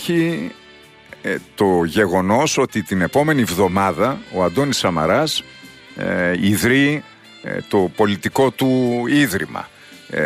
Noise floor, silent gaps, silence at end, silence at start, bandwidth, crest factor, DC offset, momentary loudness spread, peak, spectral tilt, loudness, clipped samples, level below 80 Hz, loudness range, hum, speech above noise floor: -45 dBFS; none; 0 s; 0 s; 15.5 kHz; 16 dB; under 0.1%; 12 LU; -4 dBFS; -5 dB/octave; -18 LUFS; under 0.1%; -50 dBFS; 2 LU; none; 27 dB